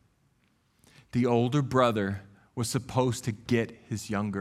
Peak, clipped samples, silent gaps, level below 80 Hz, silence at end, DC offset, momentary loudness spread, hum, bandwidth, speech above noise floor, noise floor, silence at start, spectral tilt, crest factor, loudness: -8 dBFS; under 0.1%; none; -60 dBFS; 0 s; under 0.1%; 10 LU; none; 14.5 kHz; 41 dB; -69 dBFS; 1.15 s; -6 dB/octave; 20 dB; -29 LUFS